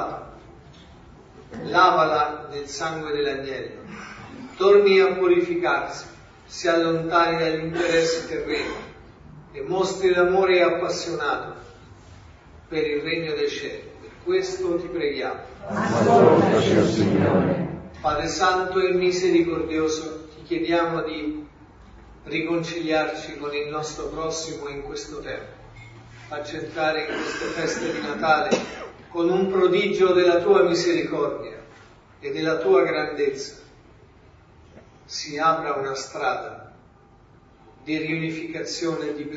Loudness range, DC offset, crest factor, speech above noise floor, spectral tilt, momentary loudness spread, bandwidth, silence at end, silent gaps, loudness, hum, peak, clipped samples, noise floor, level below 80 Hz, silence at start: 8 LU; under 0.1%; 20 dB; 30 dB; -5 dB/octave; 18 LU; 7.8 kHz; 0 s; none; -22 LUFS; none; -4 dBFS; under 0.1%; -52 dBFS; -52 dBFS; 0 s